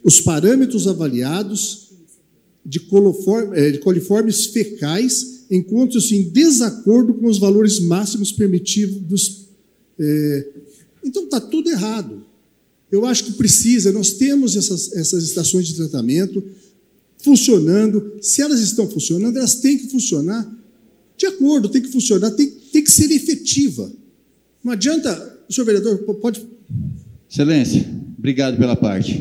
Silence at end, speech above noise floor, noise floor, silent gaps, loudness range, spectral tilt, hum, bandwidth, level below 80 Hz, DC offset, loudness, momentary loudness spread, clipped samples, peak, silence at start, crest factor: 0 s; 44 dB; -60 dBFS; none; 6 LU; -4.5 dB/octave; none; 16.5 kHz; -52 dBFS; under 0.1%; -16 LUFS; 12 LU; under 0.1%; 0 dBFS; 0.05 s; 16 dB